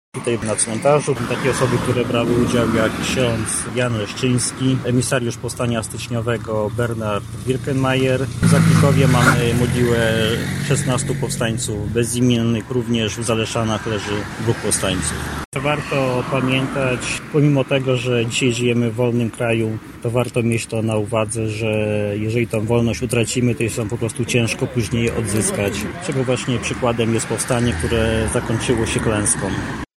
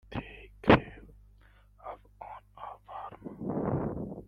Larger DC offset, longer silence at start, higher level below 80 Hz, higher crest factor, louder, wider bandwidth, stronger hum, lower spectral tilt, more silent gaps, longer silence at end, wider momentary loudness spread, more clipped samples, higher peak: neither; about the same, 0.15 s vs 0.1 s; first, -38 dBFS vs -52 dBFS; second, 18 dB vs 26 dB; first, -19 LUFS vs -30 LUFS; first, 15.5 kHz vs 10 kHz; second, none vs 50 Hz at -60 dBFS; second, -5 dB/octave vs -8.5 dB/octave; first, 15.45-15.52 s vs none; about the same, 0.15 s vs 0.05 s; second, 6 LU vs 23 LU; neither; first, 0 dBFS vs -6 dBFS